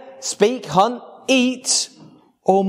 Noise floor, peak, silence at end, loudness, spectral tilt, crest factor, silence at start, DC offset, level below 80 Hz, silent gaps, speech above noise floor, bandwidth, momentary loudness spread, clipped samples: -47 dBFS; 0 dBFS; 0 s; -19 LUFS; -3 dB/octave; 20 dB; 0.05 s; under 0.1%; -64 dBFS; none; 29 dB; 15.5 kHz; 10 LU; under 0.1%